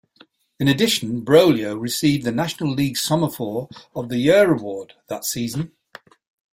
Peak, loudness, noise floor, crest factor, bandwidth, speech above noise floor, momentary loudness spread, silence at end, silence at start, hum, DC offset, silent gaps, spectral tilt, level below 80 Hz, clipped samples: -2 dBFS; -20 LUFS; -55 dBFS; 18 dB; 16.5 kHz; 35 dB; 16 LU; 0.9 s; 0.6 s; none; under 0.1%; none; -5 dB/octave; -56 dBFS; under 0.1%